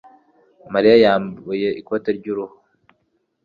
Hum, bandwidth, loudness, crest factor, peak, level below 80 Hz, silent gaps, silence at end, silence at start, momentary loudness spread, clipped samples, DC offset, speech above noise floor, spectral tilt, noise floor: none; 5 kHz; -18 LUFS; 18 dB; -2 dBFS; -60 dBFS; none; 0.95 s; 0.7 s; 15 LU; under 0.1%; under 0.1%; 51 dB; -7.5 dB/octave; -68 dBFS